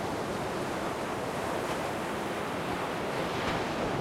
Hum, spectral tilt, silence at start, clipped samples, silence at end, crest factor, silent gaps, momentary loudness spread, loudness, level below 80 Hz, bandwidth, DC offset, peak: none; -4.5 dB/octave; 0 s; under 0.1%; 0 s; 14 dB; none; 2 LU; -33 LUFS; -54 dBFS; 16.5 kHz; under 0.1%; -20 dBFS